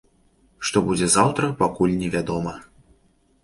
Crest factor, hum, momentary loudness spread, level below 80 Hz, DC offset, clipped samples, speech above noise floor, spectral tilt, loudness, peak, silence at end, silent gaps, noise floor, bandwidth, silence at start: 20 dB; none; 11 LU; -48 dBFS; under 0.1%; under 0.1%; 40 dB; -4.5 dB/octave; -21 LUFS; -2 dBFS; 0.8 s; none; -61 dBFS; 11.5 kHz; 0.6 s